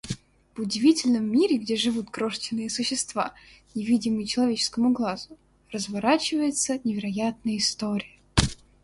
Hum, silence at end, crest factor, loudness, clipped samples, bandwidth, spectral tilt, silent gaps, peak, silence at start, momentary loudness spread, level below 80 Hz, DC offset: none; 0.3 s; 26 dB; -25 LUFS; under 0.1%; 11.5 kHz; -4 dB/octave; none; 0 dBFS; 0.05 s; 11 LU; -46 dBFS; under 0.1%